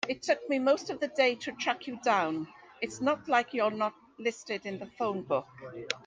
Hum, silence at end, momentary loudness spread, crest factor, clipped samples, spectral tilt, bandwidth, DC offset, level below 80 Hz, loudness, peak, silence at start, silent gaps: none; 0.05 s; 11 LU; 22 dB; under 0.1%; -4 dB/octave; 9.6 kHz; under 0.1%; -74 dBFS; -31 LUFS; -10 dBFS; 0 s; none